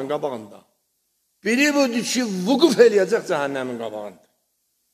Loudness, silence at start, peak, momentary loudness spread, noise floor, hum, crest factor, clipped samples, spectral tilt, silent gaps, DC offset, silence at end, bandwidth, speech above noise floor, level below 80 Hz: -20 LUFS; 0 s; -2 dBFS; 16 LU; -71 dBFS; none; 20 dB; under 0.1%; -4 dB/octave; none; under 0.1%; 0.8 s; 14 kHz; 51 dB; -74 dBFS